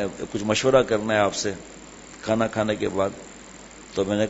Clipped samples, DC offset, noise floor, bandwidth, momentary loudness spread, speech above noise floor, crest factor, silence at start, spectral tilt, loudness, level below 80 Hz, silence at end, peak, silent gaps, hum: under 0.1%; under 0.1%; -44 dBFS; 8 kHz; 23 LU; 20 dB; 20 dB; 0 s; -4.5 dB/octave; -24 LUFS; -52 dBFS; 0 s; -4 dBFS; none; none